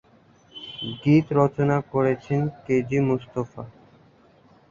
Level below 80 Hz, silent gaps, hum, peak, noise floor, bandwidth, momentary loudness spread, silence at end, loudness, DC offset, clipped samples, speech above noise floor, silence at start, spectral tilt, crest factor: -56 dBFS; none; none; -6 dBFS; -56 dBFS; 7.4 kHz; 19 LU; 1 s; -23 LUFS; under 0.1%; under 0.1%; 33 dB; 0.55 s; -8 dB/octave; 20 dB